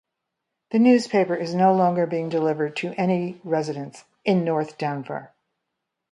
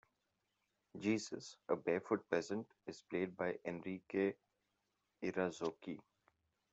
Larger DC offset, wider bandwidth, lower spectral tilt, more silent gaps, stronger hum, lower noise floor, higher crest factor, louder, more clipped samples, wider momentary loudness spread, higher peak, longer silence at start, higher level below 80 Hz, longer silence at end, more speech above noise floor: neither; first, 11 kHz vs 8.2 kHz; first, -7 dB/octave vs -5.5 dB/octave; neither; neither; second, -81 dBFS vs -86 dBFS; about the same, 18 dB vs 22 dB; first, -22 LUFS vs -42 LUFS; neither; about the same, 13 LU vs 13 LU; first, -6 dBFS vs -20 dBFS; second, 0.7 s vs 0.95 s; first, -72 dBFS vs -84 dBFS; about the same, 0.85 s vs 0.75 s; first, 59 dB vs 45 dB